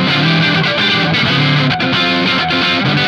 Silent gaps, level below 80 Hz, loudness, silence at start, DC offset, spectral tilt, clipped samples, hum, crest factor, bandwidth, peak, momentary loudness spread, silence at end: none; -46 dBFS; -12 LUFS; 0 s; under 0.1%; -5.5 dB/octave; under 0.1%; none; 12 dB; 10.5 kHz; 0 dBFS; 1 LU; 0 s